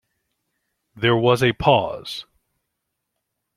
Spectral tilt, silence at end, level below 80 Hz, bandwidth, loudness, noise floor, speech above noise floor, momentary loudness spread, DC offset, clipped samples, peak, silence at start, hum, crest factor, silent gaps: -6 dB/octave; 1.35 s; -50 dBFS; 14.5 kHz; -19 LUFS; -79 dBFS; 60 dB; 15 LU; under 0.1%; under 0.1%; -2 dBFS; 0.95 s; none; 22 dB; none